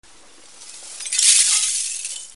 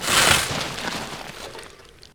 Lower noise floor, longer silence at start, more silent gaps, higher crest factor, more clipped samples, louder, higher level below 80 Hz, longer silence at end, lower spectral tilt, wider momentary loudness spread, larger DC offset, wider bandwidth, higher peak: about the same, -48 dBFS vs -46 dBFS; first, 0.6 s vs 0 s; neither; about the same, 20 dB vs 22 dB; neither; first, -15 LUFS vs -20 LUFS; second, -68 dBFS vs -46 dBFS; second, 0.05 s vs 0.25 s; second, 5.5 dB/octave vs -1.5 dB/octave; about the same, 21 LU vs 21 LU; first, 0.4% vs under 0.1%; second, 11.5 kHz vs 19.5 kHz; about the same, 0 dBFS vs -2 dBFS